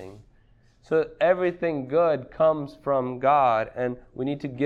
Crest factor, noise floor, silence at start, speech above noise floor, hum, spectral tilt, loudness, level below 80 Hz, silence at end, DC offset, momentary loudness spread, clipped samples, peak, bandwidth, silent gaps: 16 dB; -58 dBFS; 0 s; 34 dB; none; -8 dB/octave; -24 LUFS; -58 dBFS; 0 s; under 0.1%; 10 LU; under 0.1%; -8 dBFS; 7 kHz; none